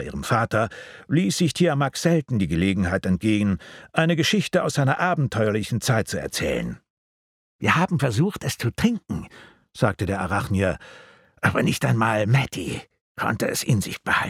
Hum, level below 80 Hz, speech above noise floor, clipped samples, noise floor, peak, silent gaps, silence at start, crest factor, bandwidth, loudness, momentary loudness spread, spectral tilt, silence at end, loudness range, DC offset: none; -48 dBFS; over 68 dB; under 0.1%; under -90 dBFS; -2 dBFS; 6.90-7.59 s, 13.01-13.15 s; 0 s; 22 dB; 16 kHz; -23 LUFS; 9 LU; -5.5 dB/octave; 0 s; 3 LU; under 0.1%